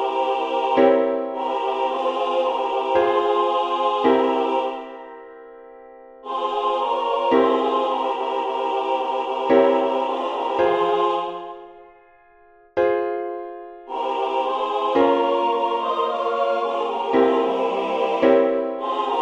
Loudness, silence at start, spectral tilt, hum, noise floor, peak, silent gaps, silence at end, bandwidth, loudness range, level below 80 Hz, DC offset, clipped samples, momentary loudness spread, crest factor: -21 LUFS; 0 s; -5 dB/octave; none; -52 dBFS; -4 dBFS; none; 0 s; 8 kHz; 4 LU; -64 dBFS; under 0.1%; under 0.1%; 12 LU; 18 dB